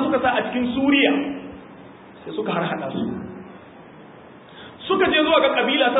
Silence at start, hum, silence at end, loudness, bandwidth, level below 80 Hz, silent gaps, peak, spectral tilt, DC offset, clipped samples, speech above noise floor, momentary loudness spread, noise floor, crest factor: 0 s; none; 0 s; -20 LUFS; 4 kHz; -54 dBFS; none; -4 dBFS; -9.5 dB/octave; under 0.1%; under 0.1%; 24 dB; 23 LU; -44 dBFS; 18 dB